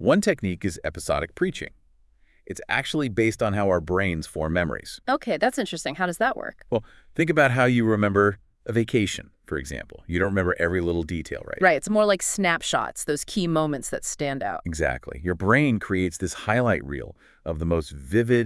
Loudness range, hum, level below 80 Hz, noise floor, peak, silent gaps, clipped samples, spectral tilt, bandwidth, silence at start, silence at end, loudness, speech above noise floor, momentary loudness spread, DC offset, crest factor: 3 LU; none; -46 dBFS; -59 dBFS; -4 dBFS; none; under 0.1%; -5 dB/octave; 12 kHz; 0 s; 0 s; -24 LUFS; 35 dB; 12 LU; under 0.1%; 20 dB